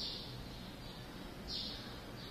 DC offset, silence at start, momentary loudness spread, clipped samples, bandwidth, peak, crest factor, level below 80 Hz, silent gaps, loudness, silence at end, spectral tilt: under 0.1%; 0 s; 8 LU; under 0.1%; 15 kHz; -30 dBFS; 16 dB; -56 dBFS; none; -45 LUFS; 0 s; -4 dB/octave